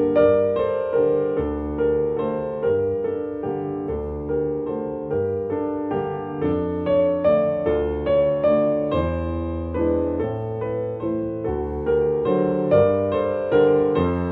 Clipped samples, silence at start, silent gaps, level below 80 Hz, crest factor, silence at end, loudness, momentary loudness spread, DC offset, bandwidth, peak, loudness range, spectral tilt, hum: under 0.1%; 0 s; none; -42 dBFS; 16 dB; 0 s; -22 LUFS; 9 LU; under 0.1%; 4.3 kHz; -4 dBFS; 4 LU; -10.5 dB/octave; none